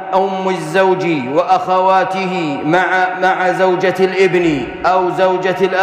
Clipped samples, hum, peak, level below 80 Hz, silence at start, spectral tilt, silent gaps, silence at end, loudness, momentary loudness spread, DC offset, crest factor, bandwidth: under 0.1%; none; -2 dBFS; -50 dBFS; 0 s; -6 dB/octave; none; 0 s; -14 LUFS; 5 LU; under 0.1%; 10 dB; 11.5 kHz